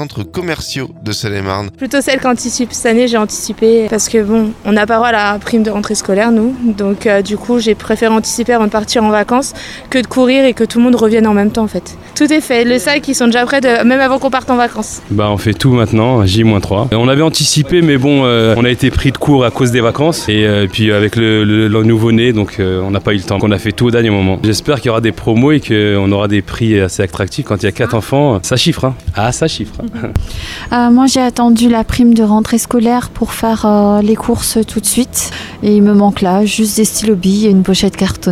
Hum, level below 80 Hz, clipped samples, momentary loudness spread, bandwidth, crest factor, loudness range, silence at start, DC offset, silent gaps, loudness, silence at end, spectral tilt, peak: none; -34 dBFS; under 0.1%; 7 LU; 15.5 kHz; 12 dB; 3 LU; 0 s; under 0.1%; none; -12 LUFS; 0 s; -5 dB/octave; 0 dBFS